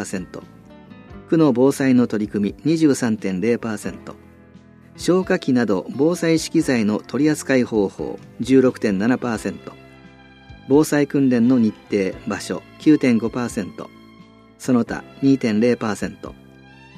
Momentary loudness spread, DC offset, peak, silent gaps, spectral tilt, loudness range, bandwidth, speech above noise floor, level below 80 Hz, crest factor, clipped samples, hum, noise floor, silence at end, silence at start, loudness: 14 LU; under 0.1%; -4 dBFS; none; -6 dB/octave; 3 LU; 15 kHz; 28 dB; -52 dBFS; 16 dB; under 0.1%; none; -46 dBFS; 0.65 s; 0 s; -19 LUFS